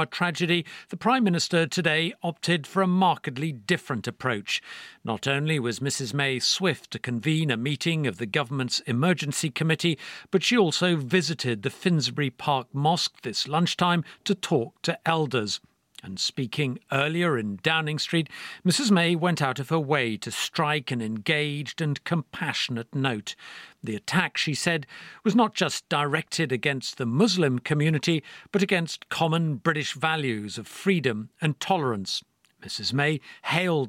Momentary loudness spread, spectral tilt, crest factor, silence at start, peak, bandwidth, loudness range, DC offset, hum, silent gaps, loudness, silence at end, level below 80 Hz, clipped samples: 7 LU; -4.5 dB/octave; 22 dB; 0 s; -4 dBFS; 16 kHz; 3 LU; under 0.1%; none; none; -26 LUFS; 0 s; -70 dBFS; under 0.1%